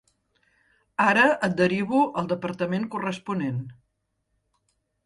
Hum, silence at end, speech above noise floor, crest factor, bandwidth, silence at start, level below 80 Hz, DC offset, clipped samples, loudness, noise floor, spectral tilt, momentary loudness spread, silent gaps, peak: none; 1.35 s; 52 dB; 20 dB; 11.5 kHz; 1 s; -66 dBFS; under 0.1%; under 0.1%; -24 LUFS; -76 dBFS; -6.5 dB/octave; 12 LU; none; -8 dBFS